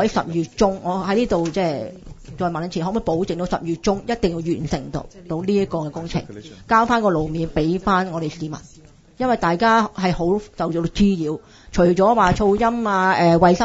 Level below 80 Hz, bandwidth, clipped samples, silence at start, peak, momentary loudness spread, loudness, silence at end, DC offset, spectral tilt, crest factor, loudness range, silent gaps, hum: -40 dBFS; 8 kHz; under 0.1%; 0 s; -2 dBFS; 12 LU; -20 LUFS; 0 s; under 0.1%; -6.5 dB/octave; 18 dB; 5 LU; none; none